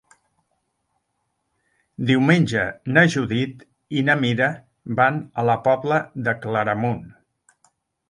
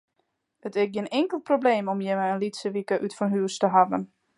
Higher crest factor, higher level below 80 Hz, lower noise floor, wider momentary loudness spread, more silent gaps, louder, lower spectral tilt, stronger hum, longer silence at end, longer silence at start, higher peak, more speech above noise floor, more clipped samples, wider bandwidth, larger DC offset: about the same, 22 dB vs 20 dB; first, -58 dBFS vs -76 dBFS; about the same, -74 dBFS vs -75 dBFS; first, 11 LU vs 8 LU; neither; first, -21 LUFS vs -25 LUFS; about the same, -6.5 dB/octave vs -5.5 dB/octave; neither; first, 1 s vs 0.3 s; first, 2 s vs 0.65 s; first, 0 dBFS vs -6 dBFS; about the same, 54 dB vs 51 dB; neither; about the same, 11.5 kHz vs 11.5 kHz; neither